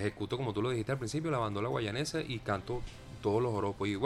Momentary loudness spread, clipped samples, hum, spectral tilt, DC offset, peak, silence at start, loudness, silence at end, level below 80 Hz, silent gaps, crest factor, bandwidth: 5 LU; under 0.1%; none; -6 dB/octave; under 0.1%; -18 dBFS; 0 s; -35 LUFS; 0 s; -54 dBFS; none; 16 dB; 13.5 kHz